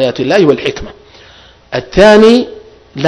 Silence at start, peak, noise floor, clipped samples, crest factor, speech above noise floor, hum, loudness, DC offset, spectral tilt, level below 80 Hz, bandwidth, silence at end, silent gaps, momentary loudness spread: 0 s; 0 dBFS; -40 dBFS; 4%; 10 dB; 32 dB; none; -8 LUFS; under 0.1%; -5.5 dB/octave; -34 dBFS; 11 kHz; 0 s; none; 20 LU